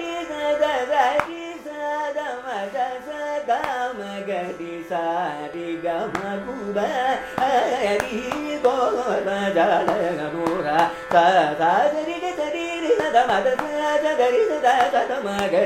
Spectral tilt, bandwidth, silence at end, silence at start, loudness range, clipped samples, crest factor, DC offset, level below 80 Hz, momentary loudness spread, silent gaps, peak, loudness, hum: -4.5 dB/octave; 16 kHz; 0 s; 0 s; 7 LU; under 0.1%; 20 dB; under 0.1%; -56 dBFS; 10 LU; none; -2 dBFS; -22 LUFS; none